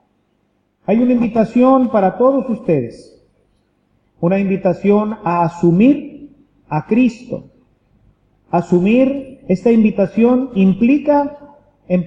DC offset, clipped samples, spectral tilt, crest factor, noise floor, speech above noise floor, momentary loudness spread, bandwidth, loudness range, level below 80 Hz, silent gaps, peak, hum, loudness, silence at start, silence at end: under 0.1%; under 0.1%; -9.5 dB/octave; 14 dB; -63 dBFS; 49 dB; 11 LU; 7.6 kHz; 4 LU; -52 dBFS; none; -2 dBFS; 50 Hz at -40 dBFS; -15 LUFS; 0.9 s; 0 s